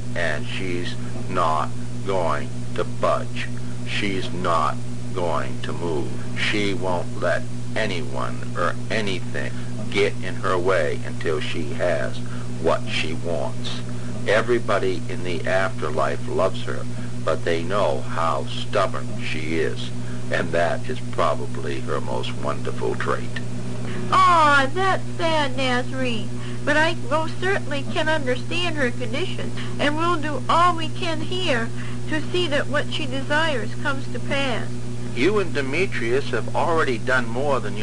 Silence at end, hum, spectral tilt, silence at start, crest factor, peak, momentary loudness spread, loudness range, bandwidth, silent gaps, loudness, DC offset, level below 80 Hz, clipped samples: 0 s; 60 Hz at -30 dBFS; -5.5 dB/octave; 0 s; 16 dB; -6 dBFS; 9 LU; 5 LU; 10 kHz; none; -24 LUFS; 6%; -44 dBFS; under 0.1%